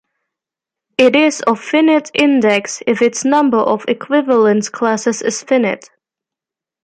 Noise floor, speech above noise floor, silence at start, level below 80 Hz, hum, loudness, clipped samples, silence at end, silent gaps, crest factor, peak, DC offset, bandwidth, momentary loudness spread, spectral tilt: -87 dBFS; 73 dB; 1 s; -62 dBFS; none; -14 LUFS; under 0.1%; 1.05 s; none; 14 dB; 0 dBFS; under 0.1%; 9.8 kHz; 6 LU; -4 dB/octave